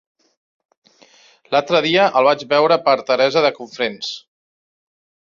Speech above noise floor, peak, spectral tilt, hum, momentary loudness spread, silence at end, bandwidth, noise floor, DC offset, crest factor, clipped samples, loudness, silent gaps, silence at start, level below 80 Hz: 34 dB; -2 dBFS; -4.5 dB/octave; none; 10 LU; 1.15 s; 7.4 kHz; -51 dBFS; under 0.1%; 18 dB; under 0.1%; -16 LUFS; none; 1.5 s; -66 dBFS